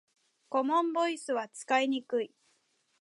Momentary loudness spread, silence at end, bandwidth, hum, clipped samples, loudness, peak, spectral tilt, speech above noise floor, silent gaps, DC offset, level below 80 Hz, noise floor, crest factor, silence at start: 7 LU; 0.75 s; 11.5 kHz; none; under 0.1%; -31 LUFS; -14 dBFS; -2.5 dB/octave; 43 dB; none; under 0.1%; -88 dBFS; -73 dBFS; 18 dB; 0.5 s